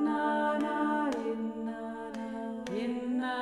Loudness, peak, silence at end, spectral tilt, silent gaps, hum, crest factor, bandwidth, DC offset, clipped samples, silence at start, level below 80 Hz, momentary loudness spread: -33 LUFS; -18 dBFS; 0 s; -5.5 dB/octave; none; none; 14 dB; 11.5 kHz; under 0.1%; under 0.1%; 0 s; -66 dBFS; 9 LU